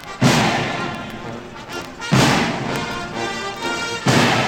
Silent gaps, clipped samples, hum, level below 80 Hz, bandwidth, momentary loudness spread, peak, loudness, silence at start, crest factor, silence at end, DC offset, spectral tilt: none; under 0.1%; none; -44 dBFS; 17 kHz; 15 LU; -2 dBFS; -19 LUFS; 0 s; 18 dB; 0 s; under 0.1%; -4.5 dB/octave